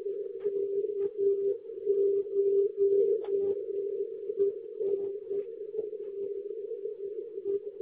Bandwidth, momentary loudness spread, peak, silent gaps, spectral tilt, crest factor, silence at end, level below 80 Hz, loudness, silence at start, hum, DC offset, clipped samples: 1.8 kHz; 11 LU; -18 dBFS; none; -8.5 dB/octave; 14 dB; 0 s; -78 dBFS; -31 LUFS; 0 s; none; under 0.1%; under 0.1%